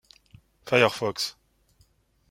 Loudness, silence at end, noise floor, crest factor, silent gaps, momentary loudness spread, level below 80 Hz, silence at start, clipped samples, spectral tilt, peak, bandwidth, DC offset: -24 LUFS; 1 s; -64 dBFS; 26 dB; none; 12 LU; -64 dBFS; 0.65 s; under 0.1%; -4 dB/octave; -4 dBFS; 16.5 kHz; under 0.1%